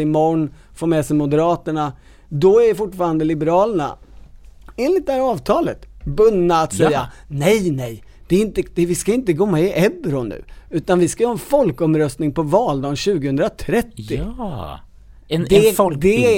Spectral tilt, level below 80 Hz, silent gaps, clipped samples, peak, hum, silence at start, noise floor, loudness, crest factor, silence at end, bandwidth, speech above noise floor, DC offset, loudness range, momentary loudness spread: -6 dB/octave; -40 dBFS; none; under 0.1%; 0 dBFS; none; 0 s; -40 dBFS; -18 LUFS; 18 dB; 0 s; 17 kHz; 23 dB; under 0.1%; 2 LU; 12 LU